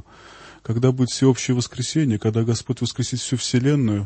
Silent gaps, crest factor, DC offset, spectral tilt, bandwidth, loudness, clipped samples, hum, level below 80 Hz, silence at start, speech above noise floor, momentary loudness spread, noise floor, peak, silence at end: none; 16 dB; under 0.1%; -5.5 dB/octave; 8.8 kHz; -21 LUFS; under 0.1%; none; -54 dBFS; 0.3 s; 24 dB; 6 LU; -45 dBFS; -4 dBFS; 0 s